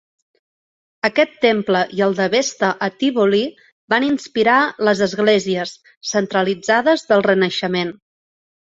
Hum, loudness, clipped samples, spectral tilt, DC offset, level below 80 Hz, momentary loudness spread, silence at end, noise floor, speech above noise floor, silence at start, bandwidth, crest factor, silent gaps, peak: none; -17 LUFS; under 0.1%; -4.5 dB/octave; under 0.1%; -62 dBFS; 7 LU; 0.7 s; under -90 dBFS; over 73 dB; 1.05 s; 8 kHz; 18 dB; 3.72-3.88 s, 5.97-6.01 s; 0 dBFS